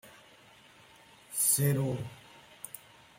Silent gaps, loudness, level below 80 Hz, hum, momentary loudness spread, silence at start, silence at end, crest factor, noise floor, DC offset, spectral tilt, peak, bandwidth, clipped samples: none; -29 LUFS; -68 dBFS; none; 22 LU; 0.05 s; 0.4 s; 20 dB; -58 dBFS; under 0.1%; -4 dB/octave; -14 dBFS; 16.5 kHz; under 0.1%